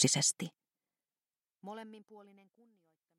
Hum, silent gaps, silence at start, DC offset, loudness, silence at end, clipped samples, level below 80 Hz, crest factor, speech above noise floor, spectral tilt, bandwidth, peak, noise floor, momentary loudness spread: none; none; 0 s; under 0.1%; -32 LUFS; 0.95 s; under 0.1%; -82 dBFS; 24 dB; over 53 dB; -2.5 dB/octave; 16 kHz; -14 dBFS; under -90 dBFS; 24 LU